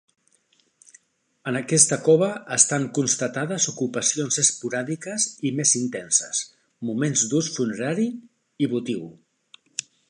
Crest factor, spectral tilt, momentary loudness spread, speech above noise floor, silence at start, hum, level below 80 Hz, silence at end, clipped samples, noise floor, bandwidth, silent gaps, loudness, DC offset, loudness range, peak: 24 dB; -3 dB/octave; 14 LU; 41 dB; 1.45 s; none; -70 dBFS; 0.3 s; under 0.1%; -65 dBFS; 11.5 kHz; none; -22 LUFS; under 0.1%; 5 LU; 0 dBFS